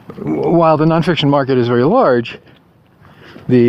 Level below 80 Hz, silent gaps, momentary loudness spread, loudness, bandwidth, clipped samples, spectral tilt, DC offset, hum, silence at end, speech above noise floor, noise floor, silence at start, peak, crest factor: -50 dBFS; none; 9 LU; -13 LUFS; 11 kHz; under 0.1%; -8.5 dB/octave; under 0.1%; none; 0 s; 35 dB; -48 dBFS; 0.1 s; 0 dBFS; 14 dB